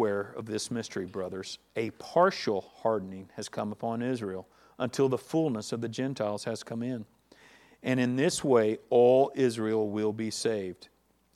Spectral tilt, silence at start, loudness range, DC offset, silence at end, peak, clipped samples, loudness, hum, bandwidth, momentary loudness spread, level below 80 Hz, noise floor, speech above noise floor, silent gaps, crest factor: -5.5 dB/octave; 0 s; 6 LU; under 0.1%; 0.5 s; -10 dBFS; under 0.1%; -30 LUFS; none; 14 kHz; 13 LU; -72 dBFS; -58 dBFS; 29 dB; none; 20 dB